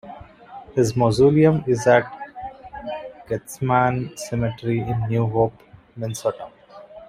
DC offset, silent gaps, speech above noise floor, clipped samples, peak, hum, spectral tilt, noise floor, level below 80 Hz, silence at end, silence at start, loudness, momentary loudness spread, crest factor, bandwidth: under 0.1%; none; 23 dB; under 0.1%; -4 dBFS; none; -6.5 dB/octave; -43 dBFS; -50 dBFS; 0.05 s; 0.05 s; -21 LUFS; 19 LU; 18 dB; 15 kHz